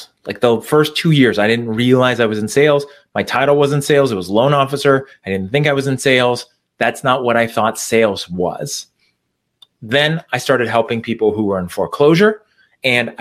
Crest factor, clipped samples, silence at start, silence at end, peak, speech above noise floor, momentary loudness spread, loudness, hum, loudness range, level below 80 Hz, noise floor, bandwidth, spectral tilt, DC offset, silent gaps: 16 dB; under 0.1%; 0 s; 0.05 s; 0 dBFS; 56 dB; 8 LU; -15 LUFS; none; 4 LU; -56 dBFS; -70 dBFS; 15.5 kHz; -5 dB/octave; under 0.1%; none